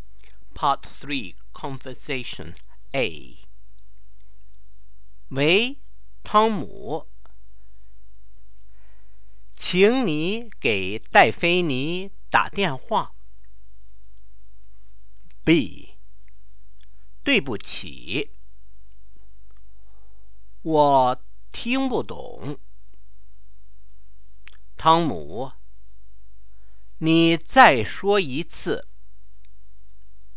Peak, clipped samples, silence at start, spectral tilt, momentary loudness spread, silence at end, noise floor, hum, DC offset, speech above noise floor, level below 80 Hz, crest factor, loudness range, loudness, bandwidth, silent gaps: 0 dBFS; under 0.1%; 0.55 s; -9 dB/octave; 18 LU; 1.55 s; -53 dBFS; none; 4%; 31 dB; -50 dBFS; 26 dB; 11 LU; -22 LUFS; 4 kHz; none